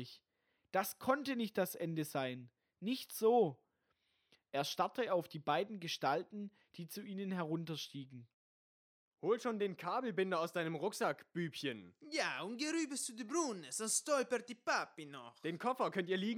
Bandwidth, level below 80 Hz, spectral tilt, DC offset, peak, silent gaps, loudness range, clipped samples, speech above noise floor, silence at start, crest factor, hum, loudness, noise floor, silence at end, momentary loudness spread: over 20 kHz; -90 dBFS; -4 dB/octave; under 0.1%; -18 dBFS; 8.34-9.11 s; 4 LU; under 0.1%; 44 dB; 0 s; 20 dB; none; -39 LUFS; -83 dBFS; 0 s; 12 LU